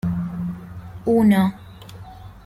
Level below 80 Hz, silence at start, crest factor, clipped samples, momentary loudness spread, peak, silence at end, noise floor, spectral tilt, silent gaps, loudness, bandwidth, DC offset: -46 dBFS; 0.05 s; 16 dB; under 0.1%; 24 LU; -6 dBFS; 0.05 s; -39 dBFS; -8 dB/octave; none; -20 LUFS; 15.5 kHz; under 0.1%